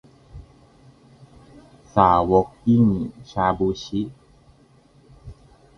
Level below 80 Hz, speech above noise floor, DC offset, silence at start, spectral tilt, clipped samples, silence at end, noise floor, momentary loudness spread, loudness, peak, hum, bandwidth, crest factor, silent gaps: -46 dBFS; 35 dB; under 0.1%; 0.35 s; -8 dB/octave; under 0.1%; 0.45 s; -54 dBFS; 12 LU; -20 LUFS; 0 dBFS; none; 6.6 kHz; 24 dB; none